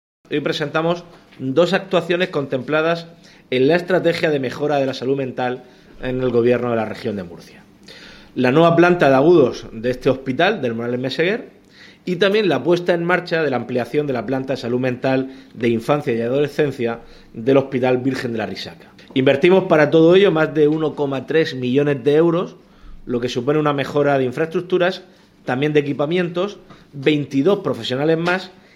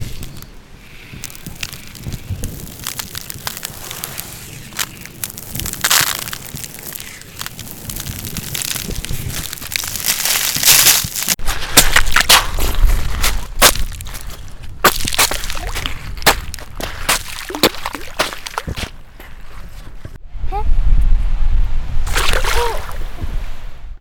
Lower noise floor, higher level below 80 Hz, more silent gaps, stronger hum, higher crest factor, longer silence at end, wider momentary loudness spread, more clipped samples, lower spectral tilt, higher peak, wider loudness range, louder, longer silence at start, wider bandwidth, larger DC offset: first, -46 dBFS vs -37 dBFS; second, -52 dBFS vs -22 dBFS; neither; neither; about the same, 18 dB vs 16 dB; first, 0.25 s vs 0.05 s; second, 12 LU vs 20 LU; neither; first, -7 dB/octave vs -1.5 dB/octave; about the same, 0 dBFS vs 0 dBFS; second, 5 LU vs 14 LU; about the same, -18 LUFS vs -17 LUFS; first, 0.3 s vs 0 s; second, 13.5 kHz vs over 20 kHz; neither